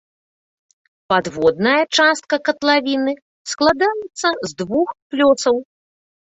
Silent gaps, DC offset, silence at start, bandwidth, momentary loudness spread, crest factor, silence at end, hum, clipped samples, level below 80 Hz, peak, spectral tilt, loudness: 3.22-3.45 s, 5.02-5.10 s; under 0.1%; 1.1 s; 8.2 kHz; 8 LU; 18 dB; 0.7 s; none; under 0.1%; -58 dBFS; -2 dBFS; -3.5 dB/octave; -17 LUFS